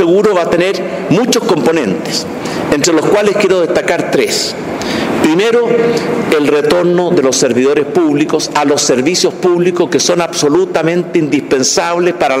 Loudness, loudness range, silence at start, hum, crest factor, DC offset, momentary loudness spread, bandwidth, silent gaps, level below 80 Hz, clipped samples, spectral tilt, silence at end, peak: -11 LUFS; 1 LU; 0 s; none; 12 dB; under 0.1%; 4 LU; 16 kHz; none; -48 dBFS; under 0.1%; -4 dB/octave; 0 s; 0 dBFS